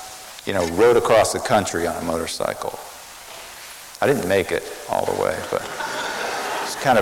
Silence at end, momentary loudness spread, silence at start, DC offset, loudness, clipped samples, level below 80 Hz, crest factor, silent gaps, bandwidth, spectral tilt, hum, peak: 0 s; 19 LU; 0 s; under 0.1%; -21 LUFS; under 0.1%; -50 dBFS; 16 dB; none; 17 kHz; -3.5 dB/octave; none; -6 dBFS